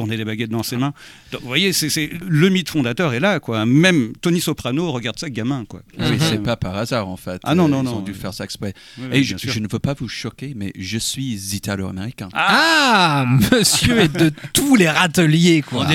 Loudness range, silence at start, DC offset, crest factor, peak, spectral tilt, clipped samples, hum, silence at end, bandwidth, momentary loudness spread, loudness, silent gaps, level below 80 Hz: 9 LU; 0 s; under 0.1%; 18 dB; 0 dBFS; -4.5 dB/octave; under 0.1%; none; 0 s; 17.5 kHz; 14 LU; -18 LUFS; none; -44 dBFS